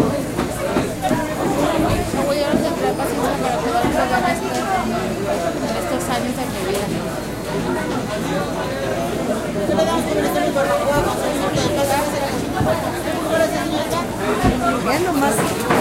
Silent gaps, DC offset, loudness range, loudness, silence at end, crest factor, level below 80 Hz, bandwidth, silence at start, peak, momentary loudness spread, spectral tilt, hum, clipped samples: none; 0.1%; 3 LU; -20 LUFS; 0 s; 16 dB; -38 dBFS; 16 kHz; 0 s; -2 dBFS; 5 LU; -5 dB/octave; none; under 0.1%